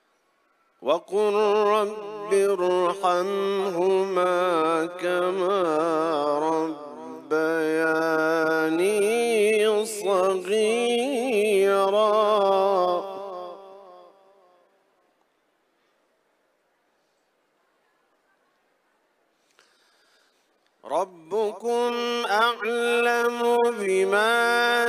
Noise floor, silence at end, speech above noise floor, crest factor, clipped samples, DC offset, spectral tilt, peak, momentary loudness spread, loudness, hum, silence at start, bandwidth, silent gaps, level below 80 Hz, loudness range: -69 dBFS; 0 s; 47 dB; 16 dB; under 0.1%; under 0.1%; -3.5 dB/octave; -8 dBFS; 8 LU; -23 LUFS; none; 0.8 s; 15.5 kHz; none; -82 dBFS; 9 LU